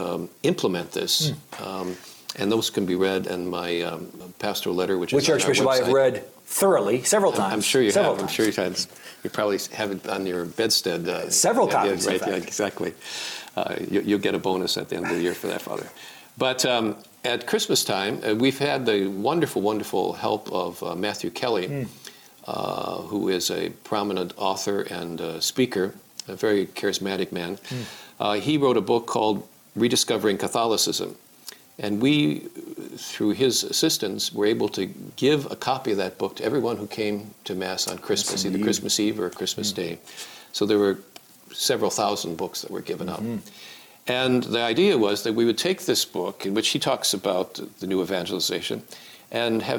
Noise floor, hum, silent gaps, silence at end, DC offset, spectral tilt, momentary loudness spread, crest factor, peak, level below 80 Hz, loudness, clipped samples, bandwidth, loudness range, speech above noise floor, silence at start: -45 dBFS; none; none; 0 s; under 0.1%; -3.5 dB/octave; 13 LU; 16 dB; -10 dBFS; -66 dBFS; -24 LUFS; under 0.1%; over 20 kHz; 5 LU; 21 dB; 0 s